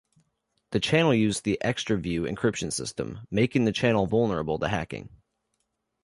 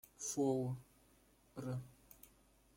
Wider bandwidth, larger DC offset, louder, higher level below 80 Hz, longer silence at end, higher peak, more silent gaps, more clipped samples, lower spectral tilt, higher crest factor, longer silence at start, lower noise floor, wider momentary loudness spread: second, 11.5 kHz vs 16.5 kHz; neither; first, -26 LUFS vs -42 LUFS; first, -52 dBFS vs -72 dBFS; first, 0.9 s vs 0.5 s; first, -8 dBFS vs -26 dBFS; neither; neither; about the same, -5 dB/octave vs -6 dB/octave; about the same, 20 dB vs 18 dB; first, 0.7 s vs 0.2 s; first, -78 dBFS vs -70 dBFS; second, 9 LU vs 24 LU